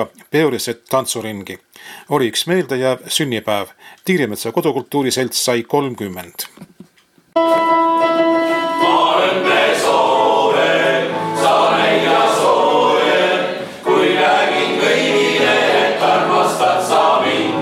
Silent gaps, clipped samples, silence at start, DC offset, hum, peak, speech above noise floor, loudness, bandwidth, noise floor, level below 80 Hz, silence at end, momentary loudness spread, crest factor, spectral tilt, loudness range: none; under 0.1%; 0 s; under 0.1%; none; -4 dBFS; 35 dB; -15 LUFS; 16.5 kHz; -53 dBFS; -64 dBFS; 0 s; 10 LU; 12 dB; -3.5 dB/octave; 6 LU